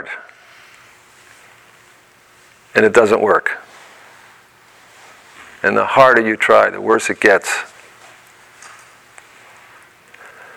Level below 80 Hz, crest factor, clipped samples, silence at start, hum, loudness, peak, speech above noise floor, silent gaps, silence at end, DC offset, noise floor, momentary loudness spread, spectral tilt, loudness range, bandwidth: -58 dBFS; 18 dB; under 0.1%; 0 s; none; -13 LUFS; 0 dBFS; 36 dB; none; 1.9 s; under 0.1%; -49 dBFS; 15 LU; -4 dB/octave; 6 LU; 16 kHz